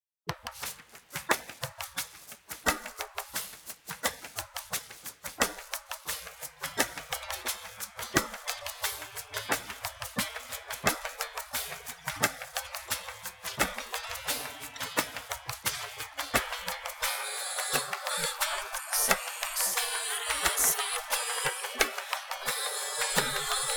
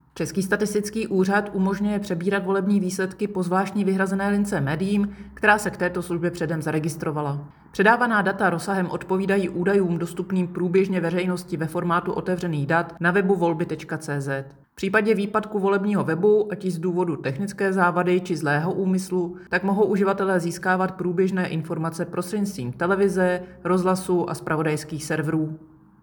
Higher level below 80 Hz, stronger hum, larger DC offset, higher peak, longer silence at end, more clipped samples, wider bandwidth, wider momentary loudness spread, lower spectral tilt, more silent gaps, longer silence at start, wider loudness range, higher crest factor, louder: about the same, -58 dBFS vs -56 dBFS; neither; neither; about the same, -4 dBFS vs -4 dBFS; second, 0 s vs 0.35 s; neither; about the same, over 20 kHz vs 20 kHz; first, 11 LU vs 7 LU; second, -1 dB/octave vs -6.5 dB/octave; neither; about the same, 0.25 s vs 0.15 s; first, 7 LU vs 2 LU; first, 30 dB vs 20 dB; second, -32 LUFS vs -23 LUFS